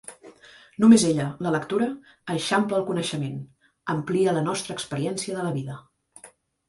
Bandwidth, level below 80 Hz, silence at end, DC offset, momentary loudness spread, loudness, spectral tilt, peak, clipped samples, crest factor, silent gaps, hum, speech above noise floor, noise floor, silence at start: 11.5 kHz; -64 dBFS; 0.4 s; under 0.1%; 20 LU; -24 LUFS; -5 dB/octave; -4 dBFS; under 0.1%; 22 dB; none; none; 29 dB; -53 dBFS; 0.1 s